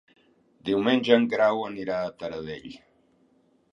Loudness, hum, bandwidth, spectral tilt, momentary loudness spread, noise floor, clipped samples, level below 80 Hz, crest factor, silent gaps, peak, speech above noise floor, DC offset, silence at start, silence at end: -25 LUFS; none; 7.4 kHz; -6 dB/octave; 17 LU; -64 dBFS; under 0.1%; -64 dBFS; 24 dB; none; -4 dBFS; 39 dB; under 0.1%; 0.65 s; 0.95 s